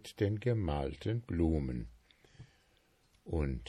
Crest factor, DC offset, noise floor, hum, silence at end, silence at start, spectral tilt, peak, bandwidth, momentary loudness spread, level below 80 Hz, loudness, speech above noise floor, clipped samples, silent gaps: 18 dB; under 0.1%; -70 dBFS; none; 0 s; 0.05 s; -8 dB/octave; -18 dBFS; 13 kHz; 11 LU; -44 dBFS; -36 LUFS; 36 dB; under 0.1%; none